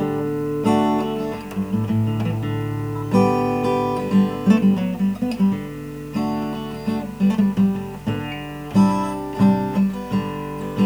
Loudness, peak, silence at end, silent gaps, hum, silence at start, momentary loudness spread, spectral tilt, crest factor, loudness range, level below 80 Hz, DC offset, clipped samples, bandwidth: -21 LUFS; -4 dBFS; 0 s; none; none; 0 s; 10 LU; -8 dB/octave; 16 dB; 3 LU; -46 dBFS; 0.2%; under 0.1%; over 20 kHz